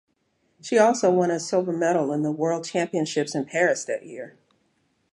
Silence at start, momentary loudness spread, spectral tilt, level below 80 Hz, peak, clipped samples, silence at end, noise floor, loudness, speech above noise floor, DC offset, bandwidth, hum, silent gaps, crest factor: 0.65 s; 13 LU; -5 dB/octave; -76 dBFS; -4 dBFS; under 0.1%; 0.85 s; -70 dBFS; -23 LUFS; 47 dB; under 0.1%; 11.5 kHz; none; none; 20 dB